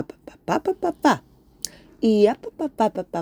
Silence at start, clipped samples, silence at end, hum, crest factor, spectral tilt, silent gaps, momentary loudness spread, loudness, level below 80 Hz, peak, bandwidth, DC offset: 0 s; under 0.1%; 0 s; none; 22 dB; -5 dB/octave; none; 15 LU; -22 LUFS; -58 dBFS; 0 dBFS; over 20 kHz; under 0.1%